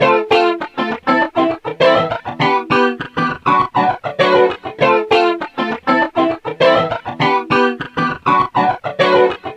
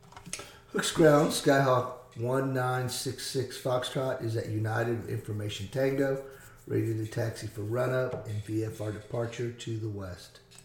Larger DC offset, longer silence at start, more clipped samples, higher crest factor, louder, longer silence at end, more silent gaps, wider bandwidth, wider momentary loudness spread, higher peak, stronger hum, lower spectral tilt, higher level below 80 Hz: neither; second, 0 s vs 0.15 s; neither; second, 14 dB vs 20 dB; first, -15 LUFS vs -30 LUFS; about the same, 0 s vs 0.1 s; neither; second, 10 kHz vs 18.5 kHz; second, 7 LU vs 14 LU; first, 0 dBFS vs -10 dBFS; neither; about the same, -6 dB/octave vs -5.5 dB/octave; first, -52 dBFS vs -60 dBFS